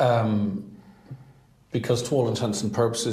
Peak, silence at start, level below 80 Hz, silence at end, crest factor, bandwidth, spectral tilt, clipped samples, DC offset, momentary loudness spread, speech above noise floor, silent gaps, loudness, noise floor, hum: -8 dBFS; 0 s; -60 dBFS; 0 s; 16 dB; 15 kHz; -5.5 dB/octave; under 0.1%; under 0.1%; 22 LU; 30 dB; none; -25 LUFS; -54 dBFS; none